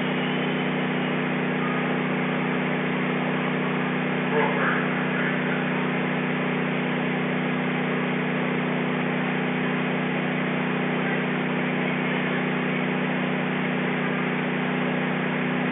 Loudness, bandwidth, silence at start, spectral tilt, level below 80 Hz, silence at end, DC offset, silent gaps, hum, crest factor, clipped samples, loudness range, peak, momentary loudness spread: -25 LUFS; 3.9 kHz; 0 s; -4.5 dB/octave; -64 dBFS; 0 s; under 0.1%; none; none; 14 dB; under 0.1%; 1 LU; -10 dBFS; 1 LU